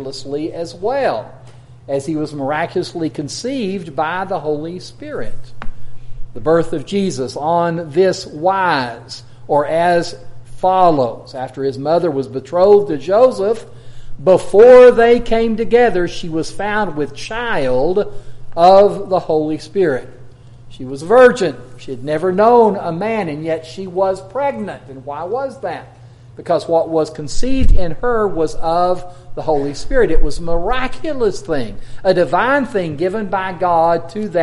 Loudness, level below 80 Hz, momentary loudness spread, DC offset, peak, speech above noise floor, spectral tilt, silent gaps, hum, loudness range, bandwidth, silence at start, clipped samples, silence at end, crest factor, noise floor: -16 LUFS; -28 dBFS; 16 LU; under 0.1%; 0 dBFS; 23 dB; -6 dB/octave; none; none; 10 LU; 11.5 kHz; 0 s; under 0.1%; 0 s; 14 dB; -37 dBFS